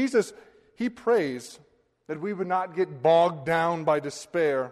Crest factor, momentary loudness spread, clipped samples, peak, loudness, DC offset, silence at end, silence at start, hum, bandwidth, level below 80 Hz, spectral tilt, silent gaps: 16 dB; 13 LU; under 0.1%; -10 dBFS; -26 LUFS; under 0.1%; 0 s; 0 s; none; 13 kHz; -68 dBFS; -5.5 dB/octave; none